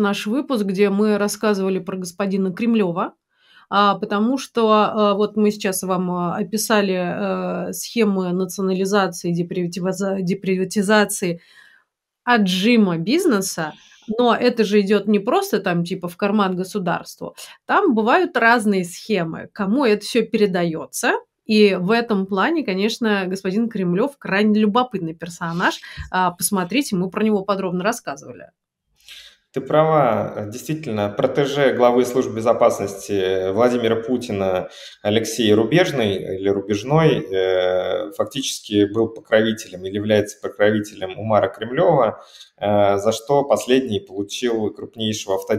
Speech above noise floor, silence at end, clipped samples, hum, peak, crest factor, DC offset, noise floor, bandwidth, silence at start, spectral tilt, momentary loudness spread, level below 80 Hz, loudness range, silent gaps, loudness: 44 dB; 0 s; under 0.1%; none; -2 dBFS; 18 dB; under 0.1%; -63 dBFS; 16 kHz; 0 s; -5 dB/octave; 10 LU; -58 dBFS; 3 LU; none; -20 LUFS